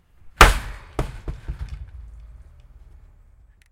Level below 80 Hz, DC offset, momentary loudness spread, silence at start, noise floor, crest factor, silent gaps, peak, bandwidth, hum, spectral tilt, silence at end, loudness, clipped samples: -28 dBFS; under 0.1%; 25 LU; 0.25 s; -52 dBFS; 24 dB; none; 0 dBFS; 16 kHz; none; -3.5 dB/octave; 1.45 s; -19 LUFS; under 0.1%